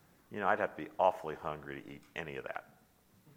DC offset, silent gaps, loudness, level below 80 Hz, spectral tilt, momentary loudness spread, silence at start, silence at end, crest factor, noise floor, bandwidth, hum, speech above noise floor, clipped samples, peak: under 0.1%; none; -37 LUFS; -70 dBFS; -6 dB/octave; 15 LU; 0.3 s; 0.05 s; 24 dB; -67 dBFS; 16.5 kHz; none; 30 dB; under 0.1%; -14 dBFS